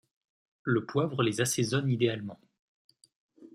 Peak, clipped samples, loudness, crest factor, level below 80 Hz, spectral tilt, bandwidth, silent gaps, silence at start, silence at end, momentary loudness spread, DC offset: -12 dBFS; under 0.1%; -29 LUFS; 20 dB; -70 dBFS; -5 dB/octave; 14.5 kHz; 2.59-2.89 s, 3.16-3.29 s; 0.65 s; 0.05 s; 11 LU; under 0.1%